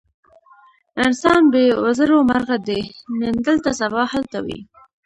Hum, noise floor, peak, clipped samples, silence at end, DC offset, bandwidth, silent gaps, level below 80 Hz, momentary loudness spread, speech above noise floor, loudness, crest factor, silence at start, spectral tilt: none; -51 dBFS; -2 dBFS; under 0.1%; 0.4 s; under 0.1%; 11 kHz; none; -50 dBFS; 13 LU; 34 dB; -18 LUFS; 16 dB; 0.95 s; -5 dB/octave